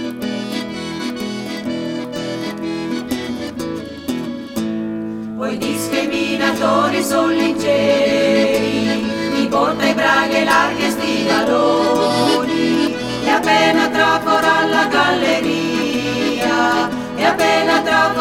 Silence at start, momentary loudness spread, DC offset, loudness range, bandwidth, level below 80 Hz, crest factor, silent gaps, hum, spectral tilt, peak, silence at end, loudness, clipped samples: 0 s; 10 LU; under 0.1%; 9 LU; 16.5 kHz; -50 dBFS; 16 dB; none; none; -4 dB/octave; -2 dBFS; 0 s; -17 LUFS; under 0.1%